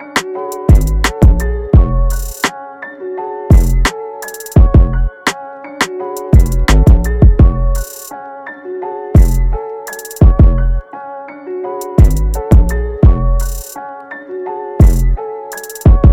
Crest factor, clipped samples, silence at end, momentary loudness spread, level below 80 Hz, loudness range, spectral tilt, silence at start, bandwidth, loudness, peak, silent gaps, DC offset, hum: 10 dB; 0.3%; 0 s; 17 LU; -12 dBFS; 2 LU; -6.5 dB/octave; 0 s; 16 kHz; -13 LUFS; 0 dBFS; none; under 0.1%; none